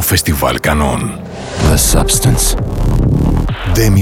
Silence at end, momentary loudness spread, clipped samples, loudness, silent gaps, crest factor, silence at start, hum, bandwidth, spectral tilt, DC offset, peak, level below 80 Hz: 0 s; 7 LU; under 0.1%; -13 LUFS; none; 12 dB; 0 s; none; 19.5 kHz; -4.5 dB/octave; under 0.1%; 0 dBFS; -18 dBFS